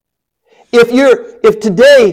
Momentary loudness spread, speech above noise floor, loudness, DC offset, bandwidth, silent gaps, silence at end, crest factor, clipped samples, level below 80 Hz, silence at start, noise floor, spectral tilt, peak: 6 LU; 57 dB; -9 LUFS; under 0.1%; 15 kHz; none; 0 s; 8 dB; under 0.1%; -48 dBFS; 0.75 s; -64 dBFS; -4.5 dB/octave; 0 dBFS